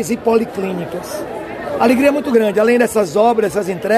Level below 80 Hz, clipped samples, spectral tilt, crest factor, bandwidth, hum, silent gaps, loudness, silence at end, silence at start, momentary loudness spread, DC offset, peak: -50 dBFS; under 0.1%; -5.5 dB/octave; 14 dB; 14.5 kHz; none; none; -16 LUFS; 0 s; 0 s; 12 LU; under 0.1%; 0 dBFS